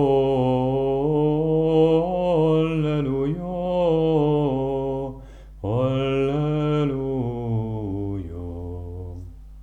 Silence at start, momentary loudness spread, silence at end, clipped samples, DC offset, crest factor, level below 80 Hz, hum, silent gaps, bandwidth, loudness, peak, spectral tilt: 0 s; 14 LU; 0 s; under 0.1%; under 0.1%; 14 dB; -42 dBFS; none; none; 7.6 kHz; -22 LUFS; -8 dBFS; -9.5 dB/octave